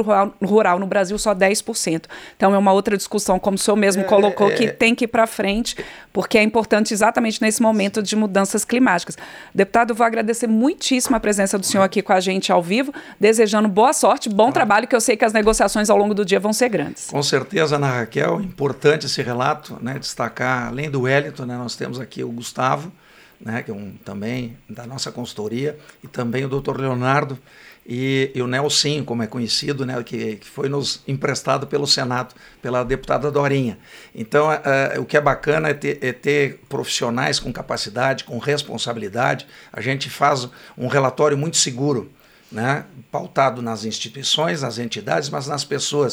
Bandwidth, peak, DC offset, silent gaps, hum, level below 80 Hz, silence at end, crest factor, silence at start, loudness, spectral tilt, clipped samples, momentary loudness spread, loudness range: over 20 kHz; -2 dBFS; under 0.1%; none; none; -48 dBFS; 0 s; 18 dB; 0 s; -19 LUFS; -4 dB/octave; under 0.1%; 12 LU; 7 LU